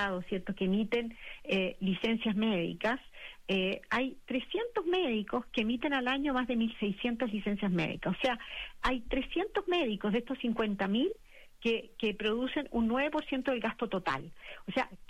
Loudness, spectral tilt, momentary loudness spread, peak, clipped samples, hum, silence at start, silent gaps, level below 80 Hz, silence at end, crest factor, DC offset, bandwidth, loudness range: -33 LUFS; -6.5 dB/octave; 6 LU; -18 dBFS; under 0.1%; none; 0 s; none; -54 dBFS; 0.05 s; 14 dB; under 0.1%; 12.5 kHz; 1 LU